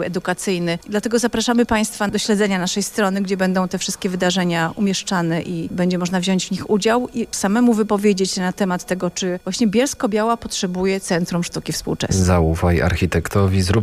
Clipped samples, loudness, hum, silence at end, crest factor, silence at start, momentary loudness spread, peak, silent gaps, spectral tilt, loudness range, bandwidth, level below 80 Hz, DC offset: under 0.1%; -19 LUFS; none; 0 s; 14 dB; 0 s; 6 LU; -6 dBFS; none; -5 dB/octave; 1 LU; 15.5 kHz; -38 dBFS; under 0.1%